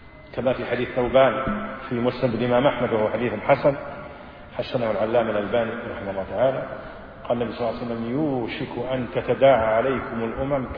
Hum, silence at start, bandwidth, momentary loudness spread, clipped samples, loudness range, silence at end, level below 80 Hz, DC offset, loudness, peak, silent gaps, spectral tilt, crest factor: none; 0 s; 5.2 kHz; 14 LU; under 0.1%; 4 LU; 0 s; -46 dBFS; under 0.1%; -23 LUFS; -6 dBFS; none; -9.5 dB/octave; 18 dB